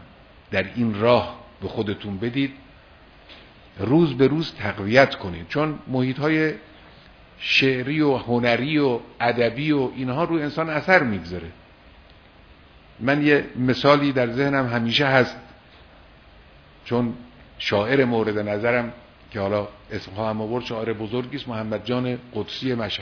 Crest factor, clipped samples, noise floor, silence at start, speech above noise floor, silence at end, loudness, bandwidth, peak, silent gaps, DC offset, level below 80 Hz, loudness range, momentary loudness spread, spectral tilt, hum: 24 dB; under 0.1%; -49 dBFS; 0 s; 28 dB; 0 s; -22 LUFS; 5.4 kHz; 0 dBFS; none; under 0.1%; -52 dBFS; 5 LU; 12 LU; -7 dB/octave; none